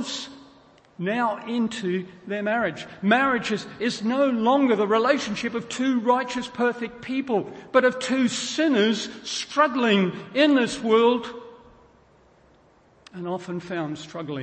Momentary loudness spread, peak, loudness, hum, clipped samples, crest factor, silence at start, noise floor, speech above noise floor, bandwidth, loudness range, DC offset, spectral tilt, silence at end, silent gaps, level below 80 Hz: 12 LU; -4 dBFS; -24 LUFS; none; under 0.1%; 20 dB; 0 s; -57 dBFS; 34 dB; 8.8 kHz; 4 LU; under 0.1%; -4.5 dB/octave; 0 s; none; -64 dBFS